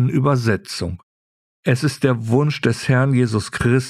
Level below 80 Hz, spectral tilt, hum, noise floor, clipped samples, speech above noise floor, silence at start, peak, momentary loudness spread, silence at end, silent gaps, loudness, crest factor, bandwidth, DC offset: -46 dBFS; -6.5 dB/octave; none; under -90 dBFS; under 0.1%; over 72 dB; 0 s; -2 dBFS; 10 LU; 0 s; 1.03-1.63 s; -19 LUFS; 16 dB; 13 kHz; under 0.1%